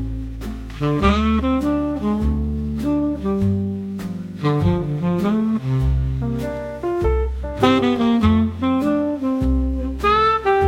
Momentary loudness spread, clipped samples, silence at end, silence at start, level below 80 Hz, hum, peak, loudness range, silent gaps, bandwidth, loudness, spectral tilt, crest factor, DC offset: 10 LU; under 0.1%; 0 s; 0 s; -28 dBFS; none; -2 dBFS; 3 LU; none; 14 kHz; -20 LUFS; -8 dB/octave; 16 dB; under 0.1%